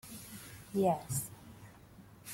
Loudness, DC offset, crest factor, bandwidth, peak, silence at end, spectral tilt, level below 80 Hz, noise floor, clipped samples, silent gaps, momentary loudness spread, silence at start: -36 LUFS; under 0.1%; 18 dB; 16.5 kHz; -20 dBFS; 0 s; -5.5 dB/octave; -66 dBFS; -57 dBFS; under 0.1%; none; 24 LU; 0.05 s